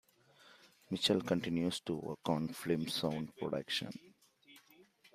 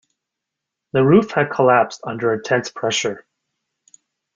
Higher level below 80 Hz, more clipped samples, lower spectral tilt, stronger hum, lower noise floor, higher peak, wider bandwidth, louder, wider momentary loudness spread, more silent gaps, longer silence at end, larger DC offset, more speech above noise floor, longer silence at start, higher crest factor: second, -72 dBFS vs -58 dBFS; neither; about the same, -5 dB/octave vs -5 dB/octave; neither; second, -65 dBFS vs -82 dBFS; second, -18 dBFS vs -2 dBFS; first, 15.5 kHz vs 9 kHz; second, -37 LUFS vs -18 LUFS; about the same, 8 LU vs 9 LU; neither; second, 0.35 s vs 1.15 s; neither; second, 29 dB vs 65 dB; second, 0.45 s vs 0.95 s; about the same, 22 dB vs 18 dB